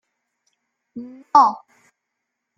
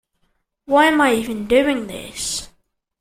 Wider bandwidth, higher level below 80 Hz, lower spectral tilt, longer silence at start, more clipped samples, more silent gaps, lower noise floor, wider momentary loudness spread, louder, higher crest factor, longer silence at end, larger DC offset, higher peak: second, 7.4 kHz vs 16 kHz; second, -74 dBFS vs -48 dBFS; about the same, -4 dB/octave vs -3 dB/octave; first, 0.95 s vs 0.7 s; neither; neither; first, -79 dBFS vs -67 dBFS; first, 23 LU vs 12 LU; about the same, -16 LUFS vs -18 LUFS; about the same, 22 dB vs 18 dB; first, 1 s vs 0.55 s; neither; about the same, -2 dBFS vs -2 dBFS